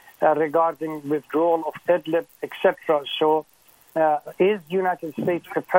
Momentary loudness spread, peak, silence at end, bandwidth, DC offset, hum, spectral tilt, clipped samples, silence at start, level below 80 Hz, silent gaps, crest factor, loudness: 6 LU; -2 dBFS; 0 s; 16.5 kHz; under 0.1%; none; -6.5 dB/octave; under 0.1%; 0.2 s; -74 dBFS; none; 20 dB; -23 LUFS